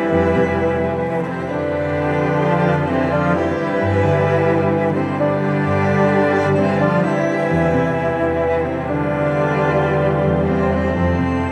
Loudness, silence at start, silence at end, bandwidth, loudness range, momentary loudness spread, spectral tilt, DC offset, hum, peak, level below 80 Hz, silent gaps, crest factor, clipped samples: -18 LUFS; 0 s; 0 s; 9.8 kHz; 2 LU; 4 LU; -8.5 dB/octave; under 0.1%; none; -4 dBFS; -38 dBFS; none; 14 dB; under 0.1%